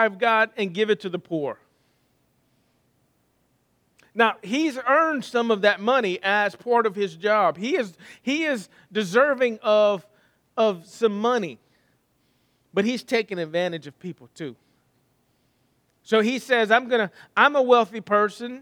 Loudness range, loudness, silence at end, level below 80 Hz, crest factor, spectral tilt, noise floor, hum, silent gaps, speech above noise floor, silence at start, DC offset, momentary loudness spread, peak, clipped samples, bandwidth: 8 LU; -22 LUFS; 0 s; -78 dBFS; 22 dB; -4.5 dB/octave; -67 dBFS; none; none; 45 dB; 0 s; under 0.1%; 14 LU; -2 dBFS; under 0.1%; 14.5 kHz